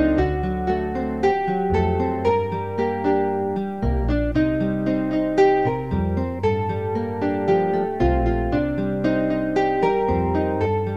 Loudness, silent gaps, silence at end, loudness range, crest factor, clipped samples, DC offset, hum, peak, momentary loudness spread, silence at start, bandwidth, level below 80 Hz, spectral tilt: -22 LUFS; none; 0 s; 1 LU; 14 dB; under 0.1%; 0.6%; none; -6 dBFS; 4 LU; 0 s; 7.6 kHz; -32 dBFS; -8.5 dB/octave